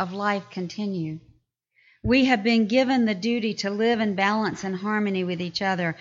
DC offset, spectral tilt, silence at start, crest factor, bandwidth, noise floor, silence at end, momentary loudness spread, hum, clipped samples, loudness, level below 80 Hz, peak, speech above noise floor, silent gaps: under 0.1%; -5.5 dB/octave; 0 s; 16 dB; 7.6 kHz; -66 dBFS; 0.05 s; 10 LU; none; under 0.1%; -24 LUFS; -52 dBFS; -8 dBFS; 42 dB; none